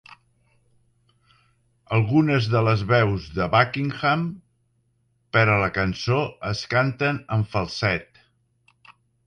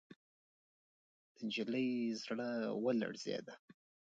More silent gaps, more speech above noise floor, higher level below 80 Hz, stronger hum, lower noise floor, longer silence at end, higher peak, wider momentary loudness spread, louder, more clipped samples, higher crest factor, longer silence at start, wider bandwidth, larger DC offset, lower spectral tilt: second, none vs 3.59-3.68 s; second, 46 dB vs over 51 dB; first, -48 dBFS vs -88 dBFS; neither; second, -68 dBFS vs under -90 dBFS; first, 1.25 s vs 0.4 s; first, -4 dBFS vs -24 dBFS; second, 7 LU vs 10 LU; first, -22 LUFS vs -40 LUFS; neither; about the same, 20 dB vs 16 dB; second, 0.1 s vs 1.4 s; first, 9 kHz vs 8 kHz; neither; first, -7 dB/octave vs -5 dB/octave